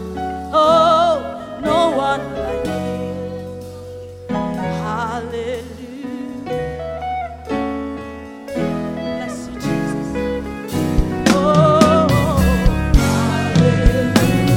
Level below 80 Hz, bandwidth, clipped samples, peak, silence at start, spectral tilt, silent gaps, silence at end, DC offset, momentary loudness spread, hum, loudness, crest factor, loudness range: -26 dBFS; 17 kHz; under 0.1%; 0 dBFS; 0 s; -6 dB/octave; none; 0 s; under 0.1%; 16 LU; none; -18 LUFS; 16 dB; 11 LU